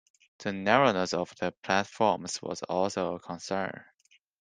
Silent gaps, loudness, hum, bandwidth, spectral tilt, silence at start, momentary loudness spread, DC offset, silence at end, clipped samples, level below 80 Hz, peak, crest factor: none; -29 LUFS; none; 10 kHz; -4.5 dB/octave; 0.4 s; 13 LU; under 0.1%; 0.6 s; under 0.1%; -70 dBFS; -4 dBFS; 26 dB